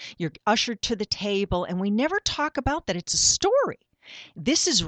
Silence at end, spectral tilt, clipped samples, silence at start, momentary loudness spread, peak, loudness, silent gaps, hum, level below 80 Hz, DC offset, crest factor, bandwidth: 0 s; -2.5 dB/octave; under 0.1%; 0 s; 11 LU; -8 dBFS; -24 LUFS; none; none; -46 dBFS; under 0.1%; 18 dB; 9.2 kHz